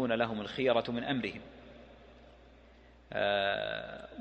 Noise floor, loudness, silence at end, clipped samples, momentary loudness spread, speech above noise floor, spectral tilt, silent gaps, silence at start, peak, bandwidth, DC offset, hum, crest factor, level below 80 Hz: -58 dBFS; -33 LUFS; 0 s; under 0.1%; 22 LU; 25 dB; -6.5 dB/octave; none; 0 s; -14 dBFS; 8.2 kHz; under 0.1%; none; 20 dB; -62 dBFS